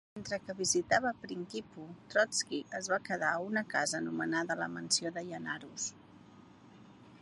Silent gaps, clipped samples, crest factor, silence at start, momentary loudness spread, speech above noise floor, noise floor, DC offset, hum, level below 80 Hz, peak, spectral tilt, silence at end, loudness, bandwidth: none; under 0.1%; 22 dB; 0.15 s; 11 LU; 22 dB; -57 dBFS; under 0.1%; none; -72 dBFS; -14 dBFS; -2.5 dB/octave; 0.05 s; -34 LUFS; 11.5 kHz